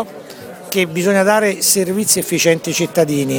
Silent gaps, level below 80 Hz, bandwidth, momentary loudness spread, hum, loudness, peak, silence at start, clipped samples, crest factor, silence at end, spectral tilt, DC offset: none; -60 dBFS; 19.5 kHz; 16 LU; none; -15 LUFS; 0 dBFS; 0 s; under 0.1%; 16 dB; 0 s; -3.5 dB/octave; under 0.1%